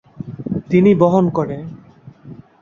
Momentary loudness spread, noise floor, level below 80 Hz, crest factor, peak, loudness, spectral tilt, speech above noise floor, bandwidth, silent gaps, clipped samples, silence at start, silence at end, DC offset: 19 LU; -42 dBFS; -52 dBFS; 16 dB; -2 dBFS; -15 LUFS; -9.5 dB/octave; 29 dB; 7 kHz; none; under 0.1%; 0.2 s; 0.2 s; under 0.1%